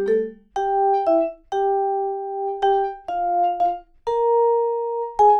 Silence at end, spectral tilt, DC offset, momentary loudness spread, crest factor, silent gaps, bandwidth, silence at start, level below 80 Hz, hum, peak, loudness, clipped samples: 0 s; -5.5 dB/octave; under 0.1%; 8 LU; 14 dB; none; 6.8 kHz; 0 s; -54 dBFS; none; -6 dBFS; -22 LUFS; under 0.1%